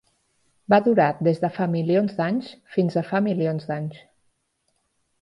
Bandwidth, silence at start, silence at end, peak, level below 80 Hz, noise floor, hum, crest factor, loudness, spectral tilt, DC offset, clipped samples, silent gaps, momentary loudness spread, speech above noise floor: 10.5 kHz; 0.7 s; 1.25 s; -6 dBFS; -66 dBFS; -72 dBFS; none; 18 dB; -23 LUFS; -9 dB/octave; under 0.1%; under 0.1%; none; 10 LU; 50 dB